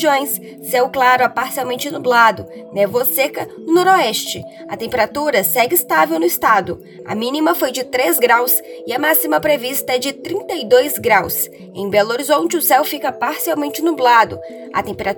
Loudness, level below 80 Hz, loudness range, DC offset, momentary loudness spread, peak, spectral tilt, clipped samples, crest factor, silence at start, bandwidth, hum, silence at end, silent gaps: -16 LUFS; -58 dBFS; 1 LU; under 0.1%; 11 LU; 0 dBFS; -2.5 dB/octave; under 0.1%; 16 dB; 0 s; over 20 kHz; none; 0 s; none